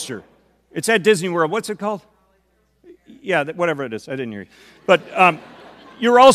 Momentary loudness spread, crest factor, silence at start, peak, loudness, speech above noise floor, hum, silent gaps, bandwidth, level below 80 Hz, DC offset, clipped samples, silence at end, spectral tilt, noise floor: 16 LU; 20 dB; 0 s; 0 dBFS; -19 LUFS; 45 dB; none; none; 14.5 kHz; -64 dBFS; under 0.1%; under 0.1%; 0 s; -4 dB/octave; -63 dBFS